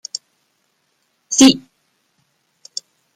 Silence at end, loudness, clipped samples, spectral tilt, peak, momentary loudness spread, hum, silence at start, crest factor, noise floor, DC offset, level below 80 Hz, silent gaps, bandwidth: 1.55 s; -13 LUFS; under 0.1%; -2 dB/octave; 0 dBFS; 20 LU; none; 1.3 s; 20 dB; -66 dBFS; under 0.1%; -62 dBFS; none; 15.5 kHz